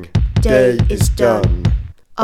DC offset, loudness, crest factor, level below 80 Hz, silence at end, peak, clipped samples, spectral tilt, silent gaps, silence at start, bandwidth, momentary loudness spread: under 0.1%; -15 LUFS; 14 dB; -20 dBFS; 0 s; 0 dBFS; under 0.1%; -6.5 dB/octave; none; 0 s; 16 kHz; 8 LU